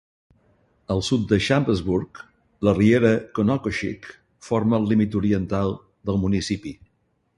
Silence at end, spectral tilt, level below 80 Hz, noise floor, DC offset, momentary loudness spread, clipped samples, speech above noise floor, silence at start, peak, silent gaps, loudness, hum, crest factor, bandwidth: 0.65 s; -6.5 dB/octave; -44 dBFS; -68 dBFS; under 0.1%; 12 LU; under 0.1%; 47 dB; 0.9 s; -4 dBFS; none; -22 LUFS; none; 18 dB; 11.5 kHz